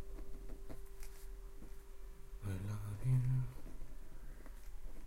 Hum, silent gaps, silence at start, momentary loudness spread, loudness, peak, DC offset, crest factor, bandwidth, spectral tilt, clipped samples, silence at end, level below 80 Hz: none; none; 0 s; 21 LU; -42 LUFS; -24 dBFS; under 0.1%; 16 dB; 16 kHz; -7.5 dB/octave; under 0.1%; 0 s; -50 dBFS